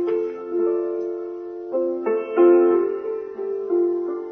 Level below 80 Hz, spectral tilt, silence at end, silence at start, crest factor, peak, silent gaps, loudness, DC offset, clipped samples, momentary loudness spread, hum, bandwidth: -70 dBFS; -8.5 dB/octave; 0 s; 0 s; 16 dB; -6 dBFS; none; -22 LUFS; under 0.1%; under 0.1%; 13 LU; none; 3.3 kHz